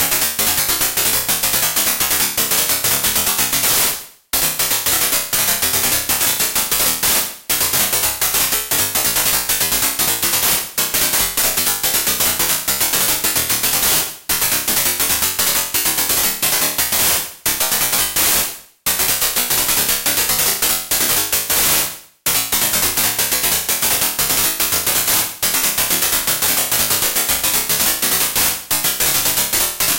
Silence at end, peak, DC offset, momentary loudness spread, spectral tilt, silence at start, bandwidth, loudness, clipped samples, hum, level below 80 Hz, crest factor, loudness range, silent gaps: 0 s; -2 dBFS; under 0.1%; 2 LU; 0 dB/octave; 0 s; 17.5 kHz; -14 LUFS; under 0.1%; none; -42 dBFS; 16 dB; 1 LU; none